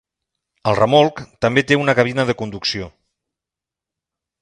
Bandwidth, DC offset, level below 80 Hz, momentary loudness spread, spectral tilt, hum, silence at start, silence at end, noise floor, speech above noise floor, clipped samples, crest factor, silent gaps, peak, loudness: 11 kHz; under 0.1%; -50 dBFS; 10 LU; -5.5 dB/octave; none; 0.65 s; 1.5 s; -87 dBFS; 70 dB; under 0.1%; 20 dB; none; 0 dBFS; -17 LUFS